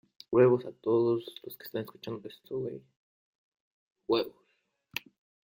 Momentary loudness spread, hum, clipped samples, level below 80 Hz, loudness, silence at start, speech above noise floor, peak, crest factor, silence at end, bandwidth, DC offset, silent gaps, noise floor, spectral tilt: 18 LU; none; under 0.1%; -72 dBFS; -31 LUFS; 0.3 s; 46 dB; -12 dBFS; 20 dB; 1.25 s; 16.5 kHz; under 0.1%; 2.96-3.52 s, 3.60-3.91 s; -76 dBFS; -7 dB/octave